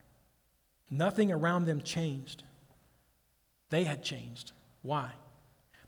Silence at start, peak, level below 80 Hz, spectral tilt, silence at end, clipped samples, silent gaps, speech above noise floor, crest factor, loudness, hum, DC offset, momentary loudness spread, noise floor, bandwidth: 0.9 s; -16 dBFS; -70 dBFS; -6 dB/octave; 0.65 s; under 0.1%; none; 40 dB; 20 dB; -33 LUFS; none; under 0.1%; 19 LU; -73 dBFS; over 20 kHz